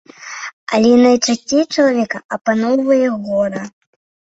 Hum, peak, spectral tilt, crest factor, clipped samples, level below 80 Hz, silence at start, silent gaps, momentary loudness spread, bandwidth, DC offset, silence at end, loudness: none; -2 dBFS; -4 dB/octave; 14 dB; under 0.1%; -58 dBFS; 0.2 s; 0.53-0.67 s, 2.25-2.29 s, 2.41-2.45 s; 17 LU; 8 kHz; under 0.1%; 0.65 s; -15 LUFS